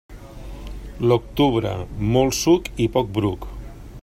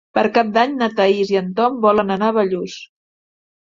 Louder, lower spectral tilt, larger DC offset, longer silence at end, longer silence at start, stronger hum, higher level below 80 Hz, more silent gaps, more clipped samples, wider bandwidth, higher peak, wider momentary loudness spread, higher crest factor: second, -21 LUFS vs -17 LUFS; about the same, -5.5 dB/octave vs -6 dB/octave; neither; second, 0 s vs 0.9 s; about the same, 0.1 s vs 0.15 s; neither; first, -36 dBFS vs -60 dBFS; neither; neither; first, 16 kHz vs 7.6 kHz; about the same, -4 dBFS vs -2 dBFS; first, 20 LU vs 7 LU; about the same, 18 dB vs 16 dB